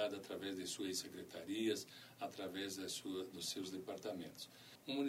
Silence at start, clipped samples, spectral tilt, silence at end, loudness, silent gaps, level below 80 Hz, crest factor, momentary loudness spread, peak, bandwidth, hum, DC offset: 0 s; under 0.1%; -3 dB/octave; 0 s; -46 LUFS; none; -86 dBFS; 16 dB; 10 LU; -28 dBFS; 16 kHz; none; under 0.1%